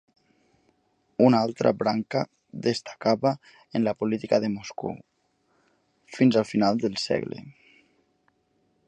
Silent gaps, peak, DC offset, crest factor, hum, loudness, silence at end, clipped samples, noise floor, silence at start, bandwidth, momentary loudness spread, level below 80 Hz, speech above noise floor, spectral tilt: none; -4 dBFS; under 0.1%; 22 dB; none; -25 LUFS; 1.35 s; under 0.1%; -70 dBFS; 1.2 s; 9.4 kHz; 15 LU; -66 dBFS; 45 dB; -6.5 dB/octave